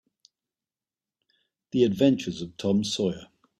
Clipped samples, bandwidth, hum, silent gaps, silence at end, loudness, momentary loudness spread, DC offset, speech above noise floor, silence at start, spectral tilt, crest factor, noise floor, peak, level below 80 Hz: under 0.1%; 13.5 kHz; none; none; 0.35 s; -26 LUFS; 11 LU; under 0.1%; over 65 dB; 1.75 s; -6 dB/octave; 20 dB; under -90 dBFS; -8 dBFS; -64 dBFS